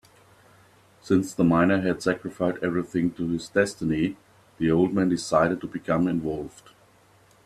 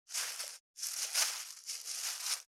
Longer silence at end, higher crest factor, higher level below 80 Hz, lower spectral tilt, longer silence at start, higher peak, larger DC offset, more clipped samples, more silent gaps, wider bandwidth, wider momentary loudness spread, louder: first, 0.95 s vs 0.1 s; about the same, 20 dB vs 22 dB; first, -56 dBFS vs under -90 dBFS; first, -6.5 dB/octave vs 5.5 dB/octave; first, 1.05 s vs 0.1 s; first, -6 dBFS vs -18 dBFS; neither; neither; second, none vs 0.60-0.74 s; second, 13 kHz vs over 20 kHz; about the same, 8 LU vs 10 LU; first, -25 LUFS vs -36 LUFS